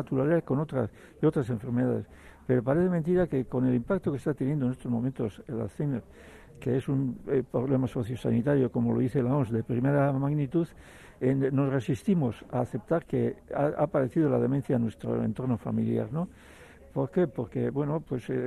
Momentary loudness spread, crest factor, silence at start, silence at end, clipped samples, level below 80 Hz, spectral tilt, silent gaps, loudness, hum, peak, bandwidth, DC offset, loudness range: 7 LU; 14 dB; 0 s; 0 s; under 0.1%; -56 dBFS; -9.5 dB/octave; none; -29 LUFS; none; -14 dBFS; 12 kHz; under 0.1%; 3 LU